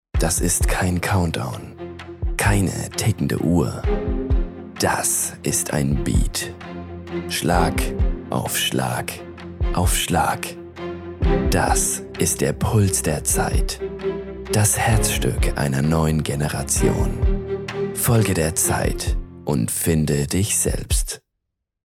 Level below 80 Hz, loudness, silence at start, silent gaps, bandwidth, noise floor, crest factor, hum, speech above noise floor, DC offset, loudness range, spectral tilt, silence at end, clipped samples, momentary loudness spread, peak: -28 dBFS; -21 LUFS; 0.15 s; none; 17 kHz; -78 dBFS; 18 dB; none; 58 dB; under 0.1%; 3 LU; -4.5 dB/octave; 0.7 s; under 0.1%; 12 LU; -4 dBFS